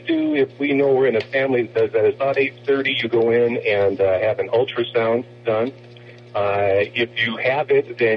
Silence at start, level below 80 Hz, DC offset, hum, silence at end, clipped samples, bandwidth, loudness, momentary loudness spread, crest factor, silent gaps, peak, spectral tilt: 0 s; -56 dBFS; under 0.1%; none; 0 s; under 0.1%; 5.8 kHz; -19 LUFS; 5 LU; 12 dB; none; -6 dBFS; -7.5 dB/octave